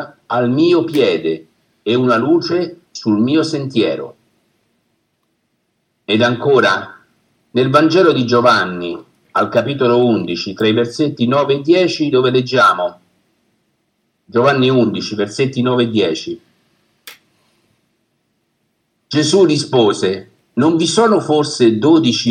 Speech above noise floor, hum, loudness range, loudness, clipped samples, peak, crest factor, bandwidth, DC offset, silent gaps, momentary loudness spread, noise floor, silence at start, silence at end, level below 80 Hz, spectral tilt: 53 dB; none; 6 LU; -14 LUFS; under 0.1%; 0 dBFS; 16 dB; 11.5 kHz; under 0.1%; none; 11 LU; -67 dBFS; 0 s; 0 s; -66 dBFS; -5.5 dB/octave